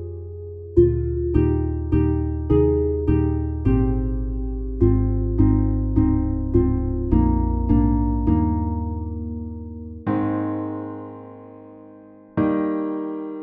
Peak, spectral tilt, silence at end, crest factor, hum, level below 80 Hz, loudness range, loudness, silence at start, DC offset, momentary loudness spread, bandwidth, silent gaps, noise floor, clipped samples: -4 dBFS; -13 dB/octave; 0 s; 18 dB; none; -26 dBFS; 7 LU; -22 LUFS; 0 s; under 0.1%; 15 LU; 3.3 kHz; none; -45 dBFS; under 0.1%